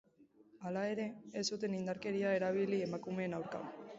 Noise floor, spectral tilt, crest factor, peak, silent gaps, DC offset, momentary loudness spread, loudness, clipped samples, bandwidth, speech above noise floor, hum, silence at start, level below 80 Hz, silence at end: -66 dBFS; -5 dB/octave; 16 dB; -22 dBFS; none; under 0.1%; 8 LU; -39 LUFS; under 0.1%; 7.6 kHz; 28 dB; none; 0.2 s; -78 dBFS; 0 s